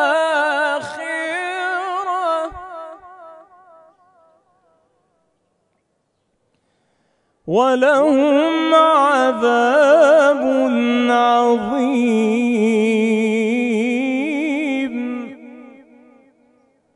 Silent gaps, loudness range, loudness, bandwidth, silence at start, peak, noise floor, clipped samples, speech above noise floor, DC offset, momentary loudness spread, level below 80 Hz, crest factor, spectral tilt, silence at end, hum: none; 12 LU; -16 LUFS; 11 kHz; 0 s; 0 dBFS; -68 dBFS; under 0.1%; 54 dB; under 0.1%; 12 LU; -60 dBFS; 16 dB; -5 dB/octave; 1.3 s; none